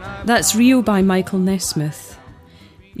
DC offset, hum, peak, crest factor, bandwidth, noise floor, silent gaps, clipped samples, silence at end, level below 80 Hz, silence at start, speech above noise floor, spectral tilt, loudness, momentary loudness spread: under 0.1%; none; -2 dBFS; 16 dB; 15.5 kHz; -45 dBFS; none; under 0.1%; 0 s; -44 dBFS; 0 s; 29 dB; -4.5 dB/octave; -16 LUFS; 14 LU